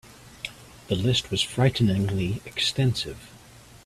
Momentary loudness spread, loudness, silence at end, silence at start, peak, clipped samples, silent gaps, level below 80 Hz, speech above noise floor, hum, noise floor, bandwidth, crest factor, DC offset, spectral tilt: 15 LU; -25 LUFS; 0.1 s; 0.25 s; -8 dBFS; under 0.1%; none; -50 dBFS; 25 dB; none; -49 dBFS; 14 kHz; 18 dB; under 0.1%; -5 dB/octave